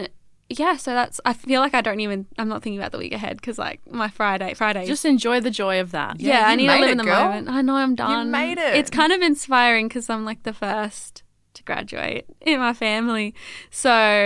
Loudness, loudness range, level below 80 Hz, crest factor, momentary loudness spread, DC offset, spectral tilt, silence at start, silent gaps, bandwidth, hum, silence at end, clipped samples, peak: -21 LUFS; 6 LU; -58 dBFS; 20 dB; 13 LU; under 0.1%; -3.5 dB/octave; 0 s; none; 12 kHz; none; 0 s; under 0.1%; 0 dBFS